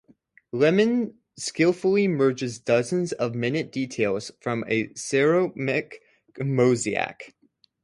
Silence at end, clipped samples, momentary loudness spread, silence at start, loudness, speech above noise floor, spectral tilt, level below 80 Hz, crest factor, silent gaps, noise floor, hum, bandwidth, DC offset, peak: 0.55 s; under 0.1%; 11 LU; 0.55 s; -24 LUFS; 35 dB; -5.5 dB/octave; -66 dBFS; 18 dB; none; -59 dBFS; none; 11.5 kHz; under 0.1%; -8 dBFS